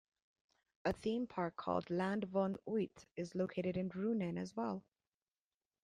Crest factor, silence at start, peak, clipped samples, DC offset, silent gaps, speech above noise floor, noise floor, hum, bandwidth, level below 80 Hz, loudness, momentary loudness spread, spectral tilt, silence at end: 18 dB; 0.85 s; -22 dBFS; under 0.1%; under 0.1%; none; over 51 dB; under -90 dBFS; none; 10.5 kHz; -70 dBFS; -40 LUFS; 5 LU; -7.5 dB/octave; 1.05 s